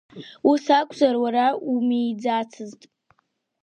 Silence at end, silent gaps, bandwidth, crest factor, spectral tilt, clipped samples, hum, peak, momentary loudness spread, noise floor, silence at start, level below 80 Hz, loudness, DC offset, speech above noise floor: 0.9 s; none; 9.2 kHz; 18 dB; -5 dB/octave; under 0.1%; none; -4 dBFS; 17 LU; -71 dBFS; 0.15 s; -74 dBFS; -22 LUFS; under 0.1%; 49 dB